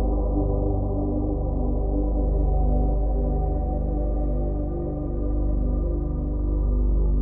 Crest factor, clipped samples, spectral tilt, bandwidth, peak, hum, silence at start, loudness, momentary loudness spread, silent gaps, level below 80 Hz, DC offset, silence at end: 10 dB; under 0.1%; -15.5 dB/octave; 1.3 kHz; -12 dBFS; 50 Hz at -25 dBFS; 0 s; -26 LUFS; 4 LU; none; -24 dBFS; under 0.1%; 0 s